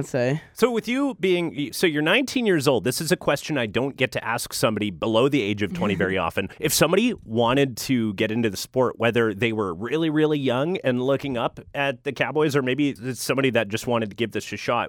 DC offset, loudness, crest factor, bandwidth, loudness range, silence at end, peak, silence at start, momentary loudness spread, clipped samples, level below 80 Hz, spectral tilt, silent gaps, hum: under 0.1%; -23 LUFS; 18 dB; 19 kHz; 2 LU; 0 s; -4 dBFS; 0 s; 6 LU; under 0.1%; -56 dBFS; -4.5 dB/octave; none; none